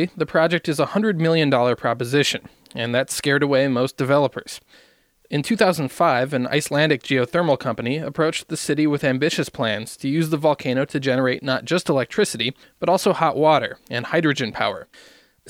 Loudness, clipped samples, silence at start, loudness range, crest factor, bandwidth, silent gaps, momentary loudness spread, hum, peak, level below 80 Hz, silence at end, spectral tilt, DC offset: -21 LUFS; under 0.1%; 0 s; 2 LU; 18 dB; 17 kHz; none; 7 LU; none; -4 dBFS; -60 dBFS; 0 s; -5 dB/octave; under 0.1%